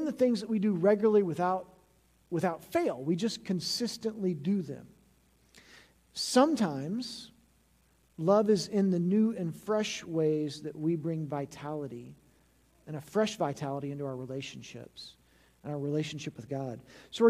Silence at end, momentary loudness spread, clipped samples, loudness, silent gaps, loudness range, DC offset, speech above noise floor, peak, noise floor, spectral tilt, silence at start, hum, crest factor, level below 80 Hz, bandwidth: 0 s; 18 LU; under 0.1%; -31 LUFS; none; 7 LU; under 0.1%; 37 dB; -12 dBFS; -67 dBFS; -6 dB/octave; 0 s; none; 20 dB; -70 dBFS; 15 kHz